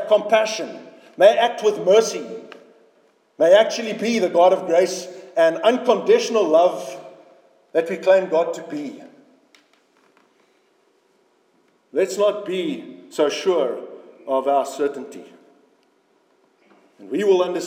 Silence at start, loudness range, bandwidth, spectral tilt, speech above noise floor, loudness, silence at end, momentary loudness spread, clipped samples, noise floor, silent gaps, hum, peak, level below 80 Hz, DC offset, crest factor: 0 s; 9 LU; 16.5 kHz; -4 dB/octave; 43 dB; -19 LUFS; 0 s; 18 LU; under 0.1%; -62 dBFS; none; none; -2 dBFS; under -90 dBFS; under 0.1%; 20 dB